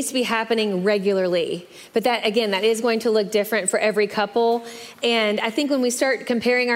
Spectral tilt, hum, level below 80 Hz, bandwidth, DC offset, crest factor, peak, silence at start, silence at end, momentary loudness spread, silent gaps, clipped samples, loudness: -3.5 dB/octave; none; -70 dBFS; 16 kHz; under 0.1%; 14 dB; -6 dBFS; 0 s; 0 s; 4 LU; none; under 0.1%; -21 LUFS